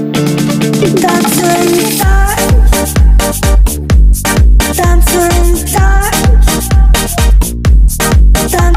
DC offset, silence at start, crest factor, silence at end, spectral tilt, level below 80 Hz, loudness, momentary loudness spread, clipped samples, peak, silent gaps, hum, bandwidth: under 0.1%; 0 s; 8 dB; 0 s; -5 dB/octave; -8 dBFS; -9 LUFS; 2 LU; under 0.1%; 0 dBFS; none; none; 16 kHz